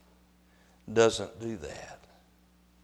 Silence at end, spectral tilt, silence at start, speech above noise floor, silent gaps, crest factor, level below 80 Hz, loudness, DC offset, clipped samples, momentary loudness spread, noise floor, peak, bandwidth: 0.9 s; -4 dB/octave; 0.85 s; 33 dB; none; 24 dB; -60 dBFS; -30 LUFS; under 0.1%; under 0.1%; 19 LU; -63 dBFS; -10 dBFS; 12 kHz